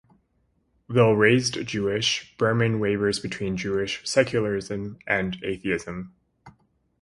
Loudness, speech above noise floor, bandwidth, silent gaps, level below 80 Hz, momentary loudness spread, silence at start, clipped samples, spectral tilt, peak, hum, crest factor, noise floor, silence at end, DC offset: -24 LUFS; 45 dB; 11.5 kHz; none; -54 dBFS; 10 LU; 0.9 s; under 0.1%; -5 dB/octave; -4 dBFS; none; 22 dB; -69 dBFS; 0.5 s; under 0.1%